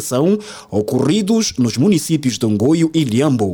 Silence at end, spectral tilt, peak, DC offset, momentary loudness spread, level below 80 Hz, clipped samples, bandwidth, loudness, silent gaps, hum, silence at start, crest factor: 0 s; -5.5 dB/octave; -4 dBFS; under 0.1%; 5 LU; -54 dBFS; under 0.1%; 19 kHz; -16 LUFS; none; none; 0 s; 12 dB